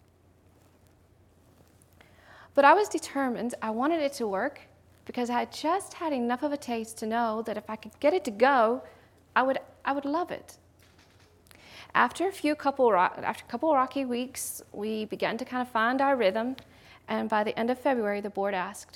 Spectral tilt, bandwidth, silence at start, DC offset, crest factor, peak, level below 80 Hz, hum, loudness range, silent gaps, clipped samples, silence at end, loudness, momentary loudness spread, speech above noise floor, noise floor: -4 dB/octave; 17.5 kHz; 2.4 s; under 0.1%; 22 dB; -6 dBFS; -70 dBFS; none; 4 LU; none; under 0.1%; 0.1 s; -28 LUFS; 11 LU; 33 dB; -61 dBFS